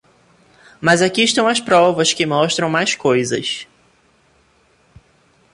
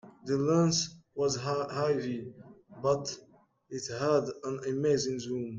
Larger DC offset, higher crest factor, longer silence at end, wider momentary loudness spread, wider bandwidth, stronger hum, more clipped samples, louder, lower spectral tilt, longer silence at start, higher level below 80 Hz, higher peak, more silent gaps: neither; about the same, 18 dB vs 16 dB; first, 1.9 s vs 0 s; second, 7 LU vs 13 LU; first, 11.5 kHz vs 9.4 kHz; neither; neither; first, -16 LUFS vs -31 LUFS; second, -3.5 dB/octave vs -5 dB/octave; first, 0.8 s vs 0.05 s; first, -58 dBFS vs -68 dBFS; first, -2 dBFS vs -14 dBFS; neither